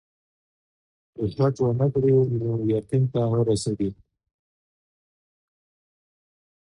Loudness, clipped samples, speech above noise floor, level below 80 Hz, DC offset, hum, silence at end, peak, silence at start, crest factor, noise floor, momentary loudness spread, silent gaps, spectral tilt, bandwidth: -23 LUFS; under 0.1%; over 68 dB; -54 dBFS; under 0.1%; none; 2.75 s; -10 dBFS; 1.2 s; 16 dB; under -90 dBFS; 9 LU; none; -8 dB/octave; 11 kHz